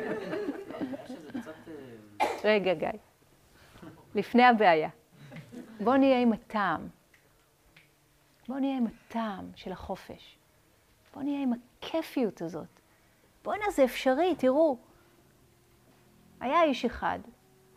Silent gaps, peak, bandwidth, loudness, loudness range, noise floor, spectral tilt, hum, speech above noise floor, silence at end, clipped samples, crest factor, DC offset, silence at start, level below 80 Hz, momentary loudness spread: none; -8 dBFS; 15.5 kHz; -29 LUFS; 11 LU; -65 dBFS; -5.5 dB/octave; none; 37 dB; 0.45 s; under 0.1%; 22 dB; under 0.1%; 0 s; -62 dBFS; 22 LU